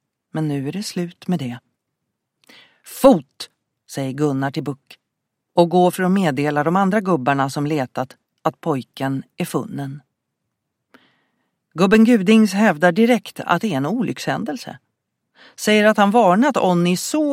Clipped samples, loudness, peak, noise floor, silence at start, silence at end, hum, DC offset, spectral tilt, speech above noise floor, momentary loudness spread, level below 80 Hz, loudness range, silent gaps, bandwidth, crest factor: under 0.1%; -18 LUFS; 0 dBFS; -78 dBFS; 0.35 s; 0 s; none; under 0.1%; -6 dB/octave; 60 dB; 17 LU; -58 dBFS; 9 LU; none; 16 kHz; 18 dB